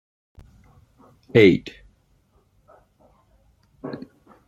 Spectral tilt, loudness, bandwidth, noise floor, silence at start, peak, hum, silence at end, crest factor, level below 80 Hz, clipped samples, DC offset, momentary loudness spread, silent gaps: -7.5 dB/octave; -17 LUFS; 12 kHz; -62 dBFS; 1.35 s; -2 dBFS; none; 0.5 s; 24 dB; -56 dBFS; under 0.1%; under 0.1%; 24 LU; none